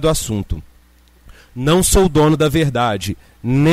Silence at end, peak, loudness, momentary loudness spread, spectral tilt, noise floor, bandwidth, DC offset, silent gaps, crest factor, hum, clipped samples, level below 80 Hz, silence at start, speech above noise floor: 0 s; -2 dBFS; -16 LUFS; 15 LU; -5 dB/octave; -49 dBFS; 16 kHz; under 0.1%; none; 14 dB; none; under 0.1%; -28 dBFS; 0 s; 34 dB